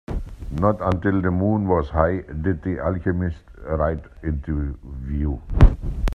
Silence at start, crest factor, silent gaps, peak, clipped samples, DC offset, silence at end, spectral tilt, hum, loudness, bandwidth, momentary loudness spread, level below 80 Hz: 0.1 s; 20 dB; none; 0 dBFS; under 0.1%; under 0.1%; 0.05 s; -9.5 dB/octave; none; -23 LUFS; 6.6 kHz; 12 LU; -26 dBFS